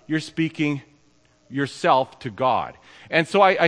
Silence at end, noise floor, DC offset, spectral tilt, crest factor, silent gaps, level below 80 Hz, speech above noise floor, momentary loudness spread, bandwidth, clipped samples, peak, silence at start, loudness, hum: 0 s; -59 dBFS; under 0.1%; -5.5 dB/octave; 20 dB; none; -64 dBFS; 37 dB; 13 LU; 10.5 kHz; under 0.1%; -2 dBFS; 0.1 s; -23 LUFS; none